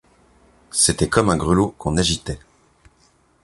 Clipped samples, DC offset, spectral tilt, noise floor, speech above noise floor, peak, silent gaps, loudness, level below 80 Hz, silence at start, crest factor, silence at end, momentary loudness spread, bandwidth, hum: under 0.1%; under 0.1%; -4 dB/octave; -58 dBFS; 40 dB; -2 dBFS; none; -19 LUFS; -38 dBFS; 0.75 s; 20 dB; 1.05 s; 10 LU; 11.5 kHz; none